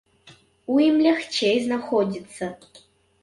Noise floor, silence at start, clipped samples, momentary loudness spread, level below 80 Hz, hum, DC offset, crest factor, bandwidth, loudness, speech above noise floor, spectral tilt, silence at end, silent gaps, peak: -53 dBFS; 0.25 s; under 0.1%; 15 LU; -66 dBFS; none; under 0.1%; 16 dB; 11.5 kHz; -22 LUFS; 31 dB; -5 dB/octave; 0.65 s; none; -8 dBFS